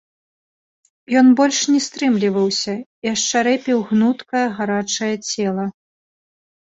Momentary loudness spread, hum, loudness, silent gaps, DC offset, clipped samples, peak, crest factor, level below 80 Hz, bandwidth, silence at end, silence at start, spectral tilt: 9 LU; none; -18 LUFS; 2.86-3.02 s; under 0.1%; under 0.1%; -2 dBFS; 16 dB; -64 dBFS; 8 kHz; 0.95 s; 1.1 s; -3.5 dB/octave